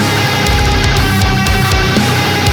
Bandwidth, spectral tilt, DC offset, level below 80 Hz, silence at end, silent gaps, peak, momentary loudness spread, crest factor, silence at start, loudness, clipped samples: over 20 kHz; -4.5 dB/octave; under 0.1%; -20 dBFS; 0 s; none; -2 dBFS; 1 LU; 10 dB; 0 s; -11 LUFS; under 0.1%